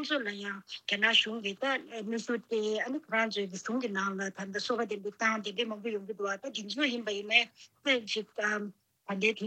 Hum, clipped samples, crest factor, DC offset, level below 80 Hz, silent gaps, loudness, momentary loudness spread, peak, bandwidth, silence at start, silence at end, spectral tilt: none; under 0.1%; 24 dB; under 0.1%; -88 dBFS; none; -32 LUFS; 11 LU; -10 dBFS; 9.2 kHz; 0 s; 0 s; -3 dB/octave